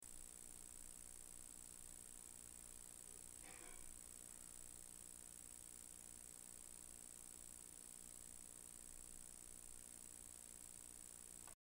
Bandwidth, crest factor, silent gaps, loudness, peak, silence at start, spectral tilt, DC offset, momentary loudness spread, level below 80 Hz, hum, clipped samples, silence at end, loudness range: 16 kHz; 16 dB; none; -56 LUFS; -42 dBFS; 0 s; -1.5 dB/octave; under 0.1%; 0 LU; -70 dBFS; 60 Hz at -75 dBFS; under 0.1%; 0.25 s; 0 LU